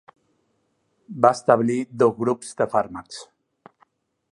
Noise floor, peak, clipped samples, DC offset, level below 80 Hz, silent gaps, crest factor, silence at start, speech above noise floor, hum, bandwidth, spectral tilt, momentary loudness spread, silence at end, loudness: -70 dBFS; -2 dBFS; under 0.1%; under 0.1%; -66 dBFS; none; 22 dB; 1.1 s; 49 dB; none; 11.5 kHz; -6 dB/octave; 19 LU; 1.1 s; -21 LUFS